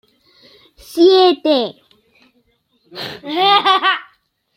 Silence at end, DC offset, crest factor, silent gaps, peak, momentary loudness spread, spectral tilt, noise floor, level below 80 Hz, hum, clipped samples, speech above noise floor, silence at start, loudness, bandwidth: 0.55 s; under 0.1%; 16 dB; none; 0 dBFS; 18 LU; -4 dB/octave; -61 dBFS; -62 dBFS; none; under 0.1%; 48 dB; 0.9 s; -14 LUFS; 15.5 kHz